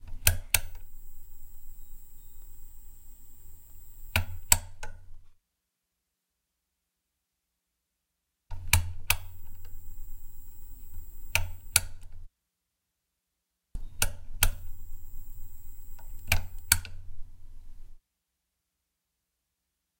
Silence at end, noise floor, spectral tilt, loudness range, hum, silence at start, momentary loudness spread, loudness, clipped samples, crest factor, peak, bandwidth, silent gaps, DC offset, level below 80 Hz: 2.05 s; -83 dBFS; -1 dB/octave; 3 LU; none; 0 s; 26 LU; -28 LUFS; under 0.1%; 34 dB; 0 dBFS; 16.5 kHz; none; under 0.1%; -40 dBFS